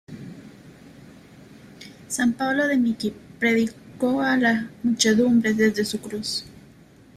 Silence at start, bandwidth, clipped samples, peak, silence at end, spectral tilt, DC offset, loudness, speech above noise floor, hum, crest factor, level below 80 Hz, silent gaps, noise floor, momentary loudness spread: 0.1 s; 14.5 kHz; under 0.1%; -6 dBFS; 0.6 s; -4 dB/octave; under 0.1%; -22 LUFS; 29 dB; none; 18 dB; -60 dBFS; none; -50 dBFS; 21 LU